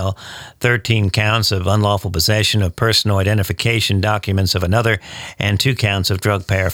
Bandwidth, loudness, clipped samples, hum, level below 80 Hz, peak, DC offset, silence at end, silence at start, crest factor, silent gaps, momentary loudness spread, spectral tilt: 17 kHz; -16 LUFS; under 0.1%; none; -38 dBFS; -2 dBFS; under 0.1%; 0 s; 0 s; 14 dB; none; 6 LU; -4.5 dB/octave